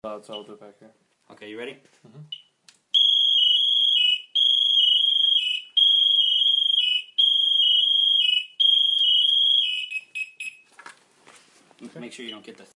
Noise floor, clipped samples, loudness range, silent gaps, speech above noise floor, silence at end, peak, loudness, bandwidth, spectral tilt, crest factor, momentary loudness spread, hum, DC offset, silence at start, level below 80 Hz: -59 dBFS; under 0.1%; 7 LU; none; 19 dB; 0.25 s; -8 dBFS; -17 LUFS; 11 kHz; 0 dB/octave; 14 dB; 21 LU; none; under 0.1%; 0.05 s; -82 dBFS